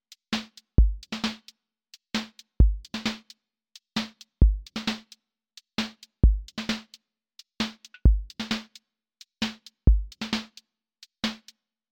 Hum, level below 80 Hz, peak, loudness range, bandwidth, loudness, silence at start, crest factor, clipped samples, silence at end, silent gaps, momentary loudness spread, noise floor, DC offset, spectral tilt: none; -28 dBFS; -6 dBFS; 2 LU; 9 kHz; -29 LUFS; 0.3 s; 22 dB; under 0.1%; 0.55 s; none; 11 LU; -58 dBFS; under 0.1%; -5.5 dB/octave